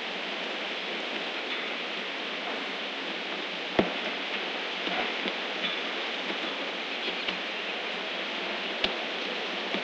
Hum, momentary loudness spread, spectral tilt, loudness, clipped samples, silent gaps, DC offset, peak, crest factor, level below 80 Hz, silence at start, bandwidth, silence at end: none; 3 LU; -3 dB/octave; -31 LUFS; under 0.1%; none; under 0.1%; -8 dBFS; 24 dB; -66 dBFS; 0 s; 9.4 kHz; 0 s